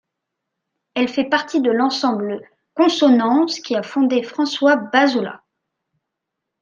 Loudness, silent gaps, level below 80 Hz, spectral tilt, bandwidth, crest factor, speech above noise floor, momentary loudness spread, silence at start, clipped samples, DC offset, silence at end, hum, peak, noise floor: -18 LUFS; none; -70 dBFS; -4 dB/octave; 7.4 kHz; 18 dB; 63 dB; 11 LU; 0.95 s; under 0.1%; under 0.1%; 1.25 s; none; -2 dBFS; -80 dBFS